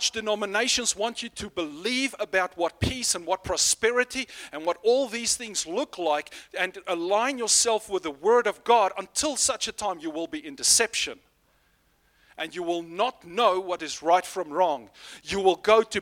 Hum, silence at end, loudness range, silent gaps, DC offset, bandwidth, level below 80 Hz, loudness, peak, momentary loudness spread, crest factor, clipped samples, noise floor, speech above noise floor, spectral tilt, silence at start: none; 0 s; 4 LU; none; under 0.1%; 16.5 kHz; -54 dBFS; -25 LUFS; -6 dBFS; 12 LU; 20 dB; under 0.1%; -66 dBFS; 40 dB; -1.5 dB/octave; 0 s